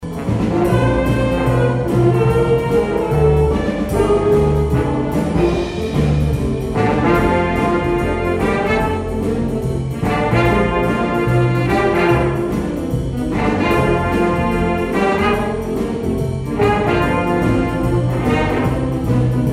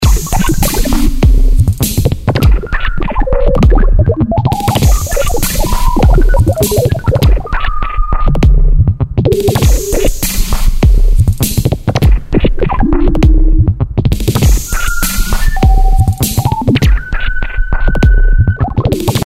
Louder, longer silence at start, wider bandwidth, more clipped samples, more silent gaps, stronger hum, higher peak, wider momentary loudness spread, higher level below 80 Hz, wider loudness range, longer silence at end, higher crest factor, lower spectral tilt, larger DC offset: second, -17 LUFS vs -12 LUFS; about the same, 0 s vs 0 s; about the same, 15 kHz vs 16.5 kHz; neither; neither; neither; second, -4 dBFS vs 0 dBFS; about the same, 6 LU vs 5 LU; second, -28 dBFS vs -10 dBFS; about the same, 2 LU vs 1 LU; about the same, 0 s vs 0.05 s; about the same, 12 dB vs 8 dB; first, -7.5 dB/octave vs -5.5 dB/octave; neither